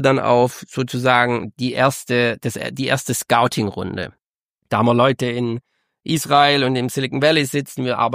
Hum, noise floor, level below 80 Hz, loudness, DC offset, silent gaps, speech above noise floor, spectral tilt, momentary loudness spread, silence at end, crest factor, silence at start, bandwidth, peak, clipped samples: none; -76 dBFS; -58 dBFS; -18 LUFS; under 0.1%; 4.30-4.56 s; 58 dB; -4.5 dB/octave; 10 LU; 0 s; 18 dB; 0 s; 15.5 kHz; 0 dBFS; under 0.1%